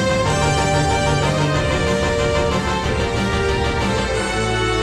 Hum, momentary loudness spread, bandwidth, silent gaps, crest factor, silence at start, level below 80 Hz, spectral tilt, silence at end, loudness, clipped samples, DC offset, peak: none; 3 LU; 13.5 kHz; none; 14 dB; 0 s; -28 dBFS; -5 dB/octave; 0 s; -18 LUFS; under 0.1%; under 0.1%; -4 dBFS